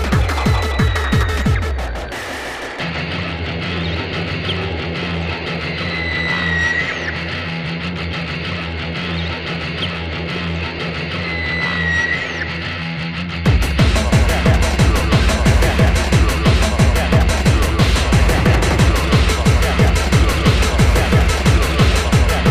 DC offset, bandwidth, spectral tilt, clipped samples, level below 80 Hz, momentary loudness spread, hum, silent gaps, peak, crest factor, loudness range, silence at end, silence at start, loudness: under 0.1%; 15.5 kHz; -5 dB/octave; under 0.1%; -20 dBFS; 9 LU; none; none; 0 dBFS; 16 dB; 7 LU; 0 s; 0 s; -17 LUFS